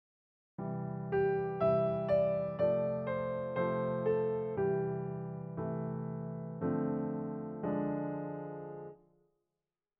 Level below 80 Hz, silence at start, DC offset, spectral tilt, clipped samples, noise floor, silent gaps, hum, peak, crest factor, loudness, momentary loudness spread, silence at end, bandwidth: -66 dBFS; 0.6 s; under 0.1%; -8.5 dB/octave; under 0.1%; under -90 dBFS; none; none; -18 dBFS; 16 dB; -35 LUFS; 11 LU; 1.05 s; 5 kHz